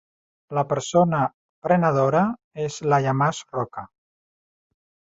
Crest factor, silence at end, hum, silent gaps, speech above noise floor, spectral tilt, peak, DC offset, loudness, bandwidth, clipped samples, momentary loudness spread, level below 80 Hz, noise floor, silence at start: 18 dB; 1.25 s; none; 1.34-1.62 s, 2.44-2.51 s; over 69 dB; -6.5 dB/octave; -6 dBFS; under 0.1%; -22 LUFS; 8 kHz; under 0.1%; 11 LU; -62 dBFS; under -90 dBFS; 0.5 s